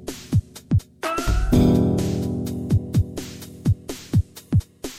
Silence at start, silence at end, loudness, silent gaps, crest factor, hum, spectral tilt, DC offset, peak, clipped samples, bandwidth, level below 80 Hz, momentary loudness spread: 0 s; 0 s; -23 LUFS; none; 16 dB; none; -7 dB/octave; under 0.1%; -6 dBFS; under 0.1%; 16 kHz; -30 dBFS; 9 LU